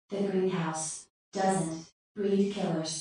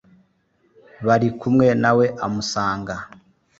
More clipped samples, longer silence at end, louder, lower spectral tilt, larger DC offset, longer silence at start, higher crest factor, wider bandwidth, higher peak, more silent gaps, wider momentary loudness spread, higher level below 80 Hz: neither; second, 0 s vs 0.5 s; second, -31 LUFS vs -20 LUFS; about the same, -5 dB/octave vs -6 dB/octave; neither; second, 0.1 s vs 1 s; about the same, 16 dB vs 18 dB; first, 10 kHz vs 8 kHz; second, -14 dBFS vs -4 dBFS; first, 1.10-1.32 s, 1.92-2.15 s vs none; about the same, 13 LU vs 14 LU; second, -72 dBFS vs -52 dBFS